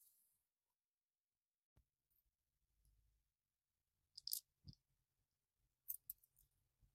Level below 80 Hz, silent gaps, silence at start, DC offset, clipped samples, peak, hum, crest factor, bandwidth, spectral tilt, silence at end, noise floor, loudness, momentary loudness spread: -86 dBFS; 0.76-0.89 s, 1.20-1.24 s, 1.64-1.76 s; 0 s; under 0.1%; under 0.1%; -20 dBFS; none; 42 dB; 15.5 kHz; -0.5 dB/octave; 0.1 s; under -90 dBFS; -51 LUFS; 19 LU